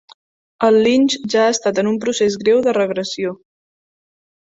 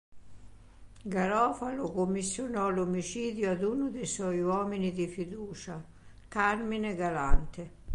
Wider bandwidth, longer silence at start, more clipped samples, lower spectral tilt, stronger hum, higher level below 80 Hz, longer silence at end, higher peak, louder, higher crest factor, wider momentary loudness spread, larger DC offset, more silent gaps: second, 8 kHz vs 11 kHz; first, 0.6 s vs 0.1 s; neither; second, -4 dB/octave vs -5.5 dB/octave; neither; second, -60 dBFS vs -42 dBFS; first, 1.05 s vs 0 s; first, -2 dBFS vs -10 dBFS; first, -16 LUFS vs -32 LUFS; about the same, 16 dB vs 20 dB; second, 9 LU vs 12 LU; neither; neither